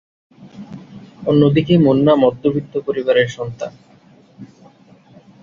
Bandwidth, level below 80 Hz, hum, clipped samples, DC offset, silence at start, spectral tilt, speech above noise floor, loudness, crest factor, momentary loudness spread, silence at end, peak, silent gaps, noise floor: 7.4 kHz; -52 dBFS; none; under 0.1%; under 0.1%; 0.45 s; -8 dB/octave; 33 dB; -15 LUFS; 16 dB; 23 LU; 0.95 s; -2 dBFS; none; -48 dBFS